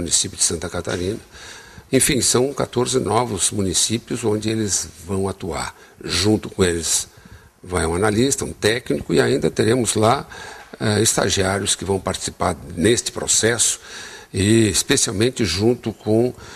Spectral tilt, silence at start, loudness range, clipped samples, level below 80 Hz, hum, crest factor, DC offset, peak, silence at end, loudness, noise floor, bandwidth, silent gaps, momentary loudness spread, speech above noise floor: -3.5 dB/octave; 0 s; 3 LU; under 0.1%; -44 dBFS; none; 18 dB; under 0.1%; -2 dBFS; 0 s; -19 LUFS; -45 dBFS; 14.5 kHz; none; 11 LU; 25 dB